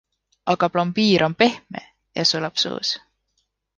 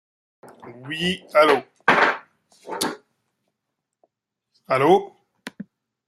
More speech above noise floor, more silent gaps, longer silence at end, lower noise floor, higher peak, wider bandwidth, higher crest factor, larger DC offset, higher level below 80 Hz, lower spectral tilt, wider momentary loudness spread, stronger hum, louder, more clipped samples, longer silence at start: second, 52 dB vs 62 dB; neither; first, 0.8 s vs 0.45 s; second, -72 dBFS vs -81 dBFS; about the same, -2 dBFS vs -2 dBFS; second, 9.8 kHz vs 13.5 kHz; about the same, 20 dB vs 22 dB; neither; about the same, -62 dBFS vs -66 dBFS; about the same, -4.5 dB/octave vs -4 dB/octave; second, 15 LU vs 24 LU; first, 50 Hz at -65 dBFS vs none; about the same, -20 LUFS vs -20 LUFS; neither; about the same, 0.45 s vs 0.45 s